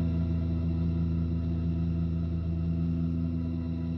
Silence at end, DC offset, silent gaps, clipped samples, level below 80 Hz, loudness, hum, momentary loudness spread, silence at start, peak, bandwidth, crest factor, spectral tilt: 0 s; under 0.1%; none; under 0.1%; -38 dBFS; -30 LUFS; none; 2 LU; 0 s; -18 dBFS; 5.6 kHz; 10 dB; -11 dB/octave